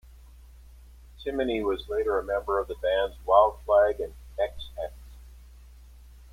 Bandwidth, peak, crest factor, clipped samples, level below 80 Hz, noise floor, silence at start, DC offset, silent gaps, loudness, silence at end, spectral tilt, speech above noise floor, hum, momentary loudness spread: 15.5 kHz; -6 dBFS; 22 dB; under 0.1%; -46 dBFS; -50 dBFS; 0.7 s; under 0.1%; none; -27 LUFS; 0.7 s; -6 dB/octave; 24 dB; none; 16 LU